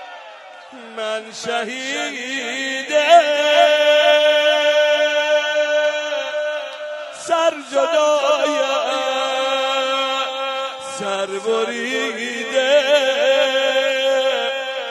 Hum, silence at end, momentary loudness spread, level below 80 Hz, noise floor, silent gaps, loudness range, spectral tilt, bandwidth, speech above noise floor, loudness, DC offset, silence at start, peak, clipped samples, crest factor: none; 0 s; 12 LU; -78 dBFS; -38 dBFS; none; 6 LU; -1 dB/octave; 13.5 kHz; 20 dB; -17 LUFS; under 0.1%; 0 s; 0 dBFS; under 0.1%; 18 dB